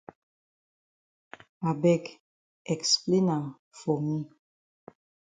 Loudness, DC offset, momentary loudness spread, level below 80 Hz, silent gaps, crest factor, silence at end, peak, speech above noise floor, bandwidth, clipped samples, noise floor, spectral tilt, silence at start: -28 LUFS; under 0.1%; 18 LU; -72 dBFS; 2.20-2.65 s, 3.59-3.71 s; 20 dB; 1.05 s; -12 dBFS; over 63 dB; 9.6 kHz; under 0.1%; under -90 dBFS; -5 dB/octave; 1.6 s